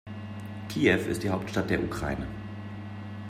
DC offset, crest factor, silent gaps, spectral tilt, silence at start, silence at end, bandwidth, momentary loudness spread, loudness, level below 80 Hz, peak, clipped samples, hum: under 0.1%; 20 dB; none; -6 dB/octave; 0.05 s; 0 s; 16 kHz; 15 LU; -30 LUFS; -50 dBFS; -10 dBFS; under 0.1%; none